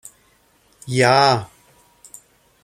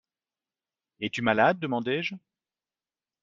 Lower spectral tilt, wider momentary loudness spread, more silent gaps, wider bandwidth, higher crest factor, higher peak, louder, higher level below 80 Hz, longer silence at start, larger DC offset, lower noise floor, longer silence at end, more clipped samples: about the same, -4.5 dB/octave vs -3.5 dB/octave; first, 27 LU vs 13 LU; neither; first, 16 kHz vs 7.6 kHz; about the same, 20 dB vs 24 dB; first, 0 dBFS vs -6 dBFS; first, -16 LUFS vs -27 LUFS; first, -60 dBFS vs -68 dBFS; second, 0.85 s vs 1 s; neither; second, -58 dBFS vs under -90 dBFS; first, 1.2 s vs 1.05 s; neither